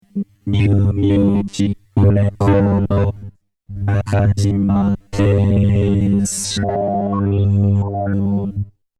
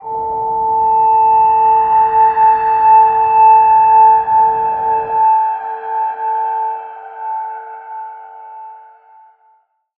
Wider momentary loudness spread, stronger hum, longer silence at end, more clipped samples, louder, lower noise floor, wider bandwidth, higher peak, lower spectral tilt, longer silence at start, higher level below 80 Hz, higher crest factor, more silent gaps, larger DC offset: second, 7 LU vs 20 LU; neither; second, 0.3 s vs 1.2 s; neither; second, -17 LUFS vs -12 LUFS; second, -37 dBFS vs -56 dBFS; first, 12 kHz vs 3.1 kHz; about the same, -2 dBFS vs -2 dBFS; about the same, -7 dB/octave vs -7.5 dB/octave; first, 0.15 s vs 0 s; first, -36 dBFS vs -52 dBFS; about the same, 14 dB vs 12 dB; neither; neither